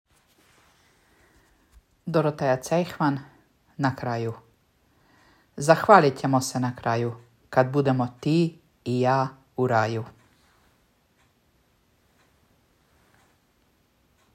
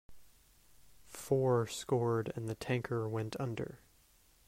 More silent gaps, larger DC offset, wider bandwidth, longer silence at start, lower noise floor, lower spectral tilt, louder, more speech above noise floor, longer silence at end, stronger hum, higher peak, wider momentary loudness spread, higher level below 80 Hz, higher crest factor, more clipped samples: neither; neither; about the same, 16 kHz vs 16 kHz; first, 2.05 s vs 0.1 s; about the same, -65 dBFS vs -67 dBFS; about the same, -6 dB/octave vs -6.5 dB/octave; first, -24 LUFS vs -36 LUFS; first, 43 dB vs 32 dB; first, 4.25 s vs 0.7 s; neither; first, -2 dBFS vs -18 dBFS; first, 15 LU vs 12 LU; about the same, -66 dBFS vs -66 dBFS; first, 26 dB vs 18 dB; neither